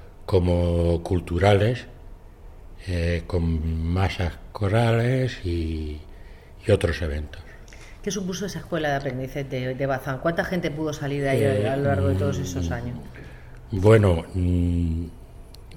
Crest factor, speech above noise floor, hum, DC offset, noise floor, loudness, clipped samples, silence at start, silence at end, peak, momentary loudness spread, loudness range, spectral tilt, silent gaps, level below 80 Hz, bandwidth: 20 dB; 20 dB; none; under 0.1%; -43 dBFS; -24 LUFS; under 0.1%; 0 s; 0 s; -4 dBFS; 15 LU; 5 LU; -7 dB/octave; none; -40 dBFS; 15.5 kHz